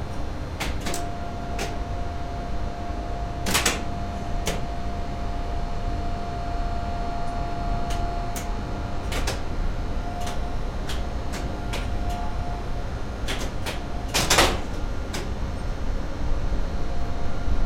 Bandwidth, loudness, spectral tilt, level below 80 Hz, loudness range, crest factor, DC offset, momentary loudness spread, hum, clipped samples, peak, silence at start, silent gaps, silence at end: 16.5 kHz; -29 LUFS; -4 dB/octave; -30 dBFS; 5 LU; 22 dB; under 0.1%; 8 LU; none; under 0.1%; -4 dBFS; 0 s; none; 0 s